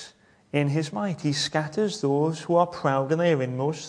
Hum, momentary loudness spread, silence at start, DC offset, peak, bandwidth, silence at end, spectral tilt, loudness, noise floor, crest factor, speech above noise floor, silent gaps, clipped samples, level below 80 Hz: none; 5 LU; 0 s; under 0.1%; -8 dBFS; 10.5 kHz; 0 s; -5.5 dB/octave; -25 LUFS; -52 dBFS; 18 dB; 27 dB; none; under 0.1%; -66 dBFS